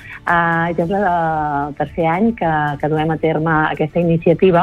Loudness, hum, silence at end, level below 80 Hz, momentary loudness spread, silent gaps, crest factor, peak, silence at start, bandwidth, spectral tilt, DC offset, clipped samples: -17 LUFS; none; 0 s; -42 dBFS; 4 LU; none; 14 dB; -2 dBFS; 0 s; 5.4 kHz; -8.5 dB/octave; under 0.1%; under 0.1%